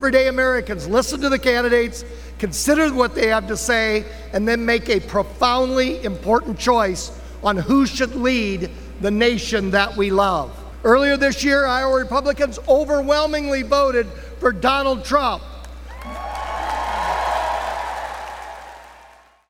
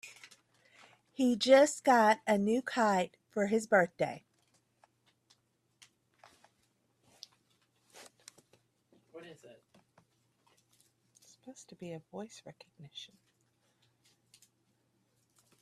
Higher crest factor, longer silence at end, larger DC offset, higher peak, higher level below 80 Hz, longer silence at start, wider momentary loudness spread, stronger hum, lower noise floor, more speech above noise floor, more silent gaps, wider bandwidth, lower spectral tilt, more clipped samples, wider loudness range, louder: second, 18 dB vs 24 dB; second, 0.55 s vs 2.6 s; neither; first, -2 dBFS vs -12 dBFS; first, -36 dBFS vs -80 dBFS; about the same, 0 s vs 0.05 s; second, 13 LU vs 28 LU; neither; second, -48 dBFS vs -76 dBFS; second, 30 dB vs 45 dB; neither; first, 18 kHz vs 13.5 kHz; about the same, -4 dB/octave vs -4.5 dB/octave; neither; second, 5 LU vs 24 LU; first, -19 LUFS vs -29 LUFS